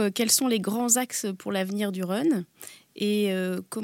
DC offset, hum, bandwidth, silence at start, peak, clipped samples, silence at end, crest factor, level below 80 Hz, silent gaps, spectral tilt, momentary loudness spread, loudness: under 0.1%; none; 17 kHz; 0 s; -8 dBFS; under 0.1%; 0 s; 20 dB; -82 dBFS; none; -3.5 dB/octave; 9 LU; -25 LUFS